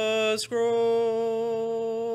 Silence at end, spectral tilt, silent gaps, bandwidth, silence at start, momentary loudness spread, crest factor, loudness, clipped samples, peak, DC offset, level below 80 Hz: 0 s; -3 dB/octave; none; 13.5 kHz; 0 s; 5 LU; 10 dB; -26 LUFS; under 0.1%; -14 dBFS; under 0.1%; -68 dBFS